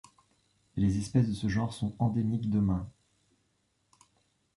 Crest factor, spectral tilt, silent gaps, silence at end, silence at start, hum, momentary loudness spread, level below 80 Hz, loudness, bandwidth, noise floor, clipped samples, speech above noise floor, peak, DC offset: 18 dB; -7.5 dB/octave; none; 1.7 s; 0.75 s; none; 7 LU; -50 dBFS; -30 LUFS; 11.5 kHz; -75 dBFS; under 0.1%; 46 dB; -14 dBFS; under 0.1%